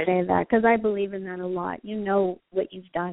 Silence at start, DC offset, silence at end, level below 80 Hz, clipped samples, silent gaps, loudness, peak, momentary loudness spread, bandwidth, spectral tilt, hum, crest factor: 0 s; under 0.1%; 0 s; -58 dBFS; under 0.1%; none; -25 LUFS; -6 dBFS; 11 LU; 4 kHz; -5.5 dB/octave; none; 18 dB